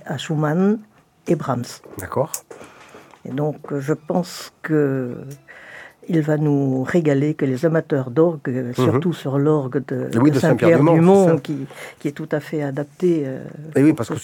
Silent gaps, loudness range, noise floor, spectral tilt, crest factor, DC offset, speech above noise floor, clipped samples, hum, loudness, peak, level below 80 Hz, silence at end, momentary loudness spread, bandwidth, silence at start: none; 8 LU; -45 dBFS; -7.5 dB/octave; 18 dB; under 0.1%; 26 dB; under 0.1%; none; -19 LUFS; 0 dBFS; -62 dBFS; 0 s; 16 LU; 17.5 kHz; 0.05 s